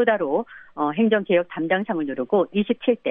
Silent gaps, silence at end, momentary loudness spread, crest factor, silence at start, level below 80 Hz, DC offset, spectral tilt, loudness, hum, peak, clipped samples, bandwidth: none; 0 s; 6 LU; 16 dB; 0 s; -68 dBFS; under 0.1%; -10 dB/octave; -22 LUFS; none; -6 dBFS; under 0.1%; 3.8 kHz